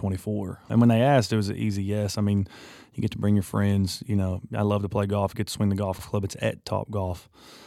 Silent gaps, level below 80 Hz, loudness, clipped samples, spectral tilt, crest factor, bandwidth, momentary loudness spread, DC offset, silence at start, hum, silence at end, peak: none; -54 dBFS; -26 LUFS; under 0.1%; -7 dB/octave; 18 dB; 15 kHz; 10 LU; under 0.1%; 0 s; none; 0 s; -8 dBFS